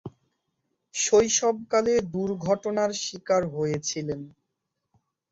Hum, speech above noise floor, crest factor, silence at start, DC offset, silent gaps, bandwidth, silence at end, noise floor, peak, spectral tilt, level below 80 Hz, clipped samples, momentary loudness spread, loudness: none; 56 dB; 18 dB; 0.05 s; under 0.1%; none; 8 kHz; 1.05 s; -81 dBFS; -8 dBFS; -3.5 dB/octave; -60 dBFS; under 0.1%; 12 LU; -25 LUFS